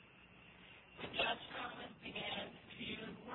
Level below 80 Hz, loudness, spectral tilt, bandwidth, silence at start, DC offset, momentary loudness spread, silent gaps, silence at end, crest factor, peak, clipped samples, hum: -72 dBFS; -44 LUFS; -6 dB/octave; 4.3 kHz; 0 s; under 0.1%; 21 LU; none; 0 s; 22 dB; -26 dBFS; under 0.1%; none